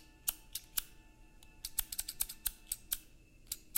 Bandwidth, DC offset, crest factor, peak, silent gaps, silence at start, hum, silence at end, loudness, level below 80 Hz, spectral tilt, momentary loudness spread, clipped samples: 17 kHz; under 0.1%; 28 dB; -16 dBFS; none; 0 s; none; 0 s; -40 LUFS; -56 dBFS; 0.5 dB/octave; 8 LU; under 0.1%